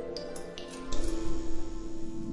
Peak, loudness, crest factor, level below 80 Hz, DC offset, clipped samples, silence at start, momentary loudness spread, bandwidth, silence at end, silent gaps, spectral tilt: -16 dBFS; -39 LUFS; 14 dB; -38 dBFS; under 0.1%; under 0.1%; 0 s; 6 LU; 11.5 kHz; 0 s; none; -5 dB/octave